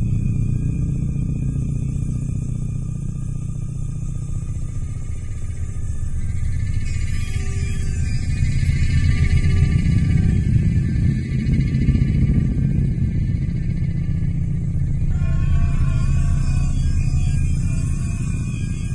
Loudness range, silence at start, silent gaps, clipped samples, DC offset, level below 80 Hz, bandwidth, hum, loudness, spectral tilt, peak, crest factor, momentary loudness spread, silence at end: 8 LU; 0 s; none; under 0.1%; under 0.1%; -22 dBFS; 11 kHz; none; -22 LUFS; -7.5 dB/octave; -4 dBFS; 14 dB; 10 LU; 0 s